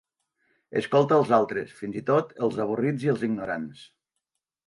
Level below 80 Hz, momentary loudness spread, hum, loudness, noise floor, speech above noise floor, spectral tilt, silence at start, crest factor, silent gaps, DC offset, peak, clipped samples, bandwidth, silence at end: -66 dBFS; 12 LU; none; -25 LUFS; -83 dBFS; 58 dB; -7.5 dB/octave; 0.7 s; 18 dB; none; under 0.1%; -8 dBFS; under 0.1%; 11.5 kHz; 0.85 s